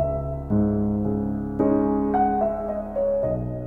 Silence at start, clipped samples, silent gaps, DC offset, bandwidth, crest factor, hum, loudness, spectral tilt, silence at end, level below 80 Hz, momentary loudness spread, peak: 0 s; under 0.1%; none; under 0.1%; 2.9 kHz; 14 dB; none; -24 LUFS; -12 dB/octave; 0 s; -38 dBFS; 6 LU; -10 dBFS